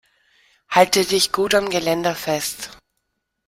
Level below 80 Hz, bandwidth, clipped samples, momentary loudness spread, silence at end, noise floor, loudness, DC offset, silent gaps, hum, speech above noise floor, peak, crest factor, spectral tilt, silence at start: -54 dBFS; 16.5 kHz; under 0.1%; 11 LU; 0.75 s; -75 dBFS; -19 LUFS; under 0.1%; none; none; 56 dB; -2 dBFS; 20 dB; -2.5 dB/octave; 0.7 s